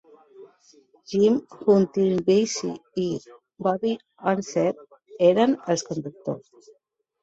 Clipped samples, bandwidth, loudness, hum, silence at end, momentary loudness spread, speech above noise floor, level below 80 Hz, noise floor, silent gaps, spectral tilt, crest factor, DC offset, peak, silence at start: under 0.1%; 8 kHz; -24 LUFS; none; 0.85 s; 13 LU; 45 dB; -66 dBFS; -67 dBFS; none; -5.5 dB/octave; 18 dB; under 0.1%; -6 dBFS; 0.4 s